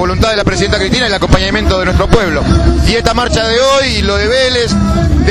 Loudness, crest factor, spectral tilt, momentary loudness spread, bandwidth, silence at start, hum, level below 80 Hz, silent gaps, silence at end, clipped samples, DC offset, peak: -11 LUFS; 10 dB; -5 dB/octave; 2 LU; 13.5 kHz; 0 s; none; -16 dBFS; none; 0 s; 0.2%; under 0.1%; 0 dBFS